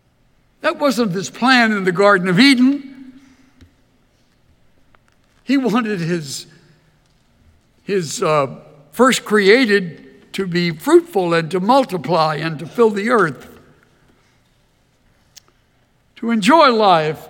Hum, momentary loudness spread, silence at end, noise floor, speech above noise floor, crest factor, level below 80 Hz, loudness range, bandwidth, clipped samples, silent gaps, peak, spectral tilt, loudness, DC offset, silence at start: none; 14 LU; 0.05 s; -58 dBFS; 43 dB; 18 dB; -62 dBFS; 8 LU; 17.5 kHz; under 0.1%; none; 0 dBFS; -5 dB/octave; -15 LUFS; under 0.1%; 0.65 s